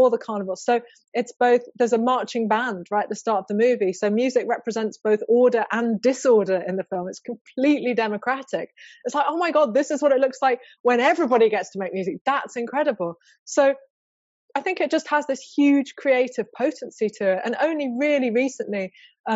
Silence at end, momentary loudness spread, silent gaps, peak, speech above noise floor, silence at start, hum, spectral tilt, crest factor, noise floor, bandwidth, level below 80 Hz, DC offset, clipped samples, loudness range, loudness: 0 s; 10 LU; 1.08-1.12 s, 7.41-7.45 s, 10.80-10.84 s, 12.21-12.25 s, 13.39-13.46 s, 13.90-14.49 s, 19.20-19.24 s; -8 dBFS; over 68 dB; 0 s; none; -3.5 dB/octave; 14 dB; under -90 dBFS; 8 kHz; -78 dBFS; under 0.1%; under 0.1%; 3 LU; -22 LUFS